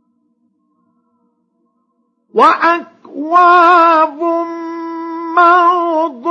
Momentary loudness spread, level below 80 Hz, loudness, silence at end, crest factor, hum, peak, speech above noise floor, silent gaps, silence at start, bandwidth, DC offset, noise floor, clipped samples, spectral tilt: 17 LU; -74 dBFS; -11 LUFS; 0 s; 14 dB; none; 0 dBFS; 53 dB; none; 2.35 s; 8.2 kHz; under 0.1%; -63 dBFS; under 0.1%; -4 dB/octave